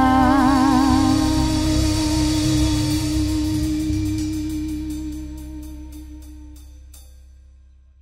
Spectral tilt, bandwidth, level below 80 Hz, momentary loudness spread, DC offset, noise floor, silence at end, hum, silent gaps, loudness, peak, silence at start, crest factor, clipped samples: -5.5 dB/octave; 16 kHz; -30 dBFS; 21 LU; under 0.1%; -48 dBFS; 0.95 s; none; none; -19 LUFS; -4 dBFS; 0 s; 16 dB; under 0.1%